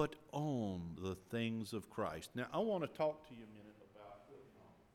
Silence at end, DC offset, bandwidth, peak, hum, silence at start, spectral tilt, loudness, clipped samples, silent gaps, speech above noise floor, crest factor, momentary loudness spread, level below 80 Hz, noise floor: 0.2 s; under 0.1%; 17 kHz; -22 dBFS; none; 0 s; -6.5 dB/octave; -42 LUFS; under 0.1%; none; 23 dB; 22 dB; 21 LU; -72 dBFS; -64 dBFS